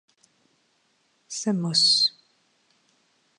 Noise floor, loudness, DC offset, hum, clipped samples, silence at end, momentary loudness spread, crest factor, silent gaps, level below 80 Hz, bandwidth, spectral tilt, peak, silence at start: -68 dBFS; -21 LUFS; under 0.1%; none; under 0.1%; 1.3 s; 13 LU; 20 dB; none; -84 dBFS; 11 kHz; -3 dB/octave; -10 dBFS; 1.3 s